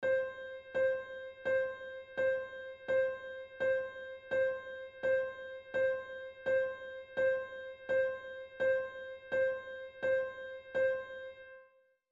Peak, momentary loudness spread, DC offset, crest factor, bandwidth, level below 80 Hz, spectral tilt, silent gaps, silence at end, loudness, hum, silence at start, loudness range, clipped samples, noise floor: -24 dBFS; 13 LU; under 0.1%; 12 dB; 7.4 kHz; -72 dBFS; -5 dB/octave; none; 0.45 s; -36 LUFS; none; 0 s; 1 LU; under 0.1%; -66 dBFS